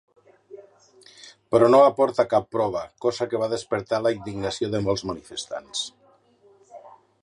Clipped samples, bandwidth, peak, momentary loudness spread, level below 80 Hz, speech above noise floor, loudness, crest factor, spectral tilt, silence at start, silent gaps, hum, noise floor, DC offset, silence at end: under 0.1%; 11 kHz; -4 dBFS; 15 LU; -58 dBFS; 36 dB; -23 LUFS; 20 dB; -5 dB/octave; 0.5 s; none; none; -58 dBFS; under 0.1%; 0.35 s